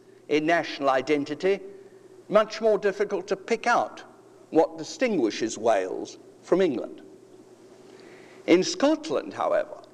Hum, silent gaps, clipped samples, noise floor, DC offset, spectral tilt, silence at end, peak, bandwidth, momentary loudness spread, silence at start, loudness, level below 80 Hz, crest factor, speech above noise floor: none; none; under 0.1%; -51 dBFS; under 0.1%; -4.5 dB/octave; 0.15 s; -6 dBFS; 11 kHz; 11 LU; 0.3 s; -25 LUFS; -70 dBFS; 20 dB; 26 dB